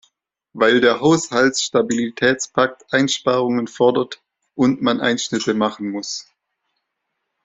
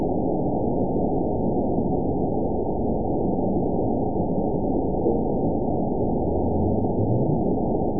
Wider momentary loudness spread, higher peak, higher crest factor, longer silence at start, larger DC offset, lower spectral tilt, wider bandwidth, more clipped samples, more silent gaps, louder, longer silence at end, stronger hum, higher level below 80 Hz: first, 12 LU vs 2 LU; first, 0 dBFS vs -10 dBFS; about the same, 18 dB vs 14 dB; first, 0.55 s vs 0 s; second, under 0.1% vs 3%; second, -4 dB/octave vs -19 dB/octave; first, 8 kHz vs 1 kHz; neither; neither; first, -18 LUFS vs -24 LUFS; first, 1.25 s vs 0 s; neither; second, -60 dBFS vs -36 dBFS